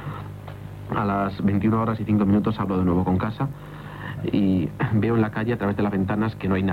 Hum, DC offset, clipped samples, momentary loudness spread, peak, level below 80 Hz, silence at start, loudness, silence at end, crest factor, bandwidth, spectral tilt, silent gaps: none; under 0.1%; under 0.1%; 14 LU; -10 dBFS; -46 dBFS; 0 s; -23 LUFS; 0 s; 14 dB; 5.2 kHz; -9.5 dB/octave; none